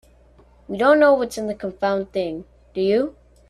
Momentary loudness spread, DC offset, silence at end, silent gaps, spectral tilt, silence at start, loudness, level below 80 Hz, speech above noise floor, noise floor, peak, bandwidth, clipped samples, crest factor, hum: 16 LU; under 0.1%; 0.4 s; none; -5.5 dB/octave; 0.7 s; -20 LUFS; -52 dBFS; 32 dB; -52 dBFS; -2 dBFS; 13 kHz; under 0.1%; 18 dB; none